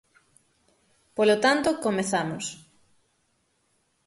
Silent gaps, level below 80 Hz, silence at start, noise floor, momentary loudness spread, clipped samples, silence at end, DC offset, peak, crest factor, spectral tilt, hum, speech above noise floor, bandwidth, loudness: none; -66 dBFS; 1.15 s; -71 dBFS; 16 LU; under 0.1%; 1.5 s; under 0.1%; -8 dBFS; 20 dB; -4 dB/octave; none; 47 dB; 12 kHz; -25 LUFS